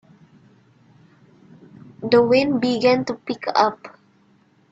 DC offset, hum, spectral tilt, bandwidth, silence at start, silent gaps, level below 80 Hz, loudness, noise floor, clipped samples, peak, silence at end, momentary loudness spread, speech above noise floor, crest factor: under 0.1%; none; -5.5 dB/octave; 7.8 kHz; 2 s; none; -64 dBFS; -19 LUFS; -58 dBFS; under 0.1%; -2 dBFS; 0.8 s; 12 LU; 39 dB; 20 dB